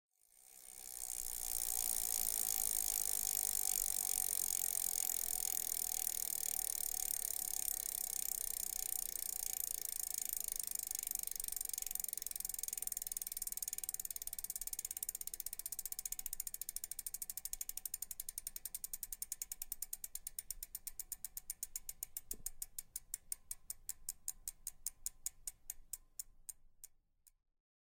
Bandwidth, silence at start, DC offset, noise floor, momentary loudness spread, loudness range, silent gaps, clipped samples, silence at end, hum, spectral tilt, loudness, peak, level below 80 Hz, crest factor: 17 kHz; 0.35 s; under 0.1%; -72 dBFS; 12 LU; 11 LU; none; under 0.1%; 0.55 s; none; 1.5 dB/octave; -40 LUFS; -18 dBFS; -62 dBFS; 26 dB